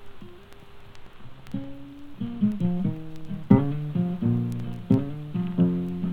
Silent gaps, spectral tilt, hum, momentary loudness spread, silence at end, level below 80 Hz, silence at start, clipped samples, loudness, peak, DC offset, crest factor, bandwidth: none; -10 dB/octave; none; 21 LU; 0 s; -50 dBFS; 0 s; under 0.1%; -26 LUFS; -2 dBFS; under 0.1%; 24 dB; 4.9 kHz